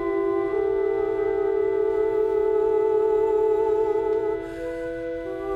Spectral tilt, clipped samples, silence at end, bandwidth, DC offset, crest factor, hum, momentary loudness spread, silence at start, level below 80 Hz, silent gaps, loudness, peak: -7.5 dB/octave; under 0.1%; 0 s; 4.6 kHz; under 0.1%; 10 dB; none; 9 LU; 0 s; -50 dBFS; none; -23 LUFS; -12 dBFS